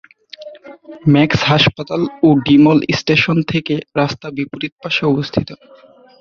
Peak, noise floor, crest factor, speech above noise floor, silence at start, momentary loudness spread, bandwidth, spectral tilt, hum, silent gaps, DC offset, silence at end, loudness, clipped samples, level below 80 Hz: -2 dBFS; -36 dBFS; 14 dB; 22 dB; 0.4 s; 15 LU; 7 kHz; -6.5 dB/octave; none; 4.72-4.77 s; under 0.1%; 0.65 s; -15 LUFS; under 0.1%; -46 dBFS